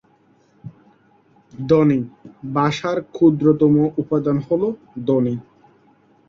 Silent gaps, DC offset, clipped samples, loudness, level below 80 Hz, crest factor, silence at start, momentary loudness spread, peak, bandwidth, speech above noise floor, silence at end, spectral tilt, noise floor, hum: none; under 0.1%; under 0.1%; -18 LUFS; -56 dBFS; 18 dB; 0.65 s; 12 LU; -2 dBFS; 7.4 kHz; 39 dB; 0.9 s; -8.5 dB/octave; -57 dBFS; none